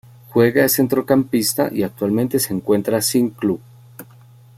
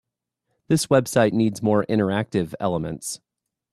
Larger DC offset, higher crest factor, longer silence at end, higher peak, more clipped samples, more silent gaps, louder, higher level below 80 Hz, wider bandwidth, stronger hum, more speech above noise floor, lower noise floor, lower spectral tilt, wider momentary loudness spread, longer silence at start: neither; about the same, 16 dB vs 18 dB; about the same, 0.55 s vs 0.55 s; about the same, -2 dBFS vs -4 dBFS; neither; neither; first, -18 LUFS vs -22 LUFS; about the same, -56 dBFS vs -56 dBFS; first, 16.5 kHz vs 14 kHz; neither; second, 28 dB vs 57 dB; second, -45 dBFS vs -78 dBFS; about the same, -4.5 dB/octave vs -5.5 dB/octave; second, 7 LU vs 11 LU; second, 0.3 s vs 0.7 s